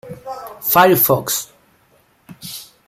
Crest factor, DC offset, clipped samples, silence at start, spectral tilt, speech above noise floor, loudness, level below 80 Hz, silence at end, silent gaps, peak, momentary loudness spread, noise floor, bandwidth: 18 dB; under 0.1%; under 0.1%; 0.05 s; -4 dB/octave; 41 dB; -14 LUFS; -58 dBFS; 0.25 s; none; 0 dBFS; 21 LU; -56 dBFS; 16 kHz